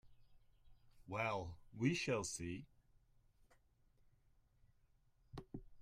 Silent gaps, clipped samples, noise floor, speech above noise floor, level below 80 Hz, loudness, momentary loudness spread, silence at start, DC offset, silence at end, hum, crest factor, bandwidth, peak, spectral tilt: none; under 0.1%; -74 dBFS; 32 dB; -68 dBFS; -43 LUFS; 18 LU; 0.05 s; under 0.1%; 0 s; none; 24 dB; 14 kHz; -24 dBFS; -4.5 dB/octave